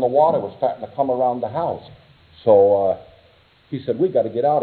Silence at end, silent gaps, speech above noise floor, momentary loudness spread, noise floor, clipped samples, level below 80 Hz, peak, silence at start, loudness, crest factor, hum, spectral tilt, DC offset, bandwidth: 0 s; none; 35 dB; 13 LU; -54 dBFS; under 0.1%; -60 dBFS; -2 dBFS; 0 s; -19 LUFS; 18 dB; none; -11 dB/octave; under 0.1%; 4.5 kHz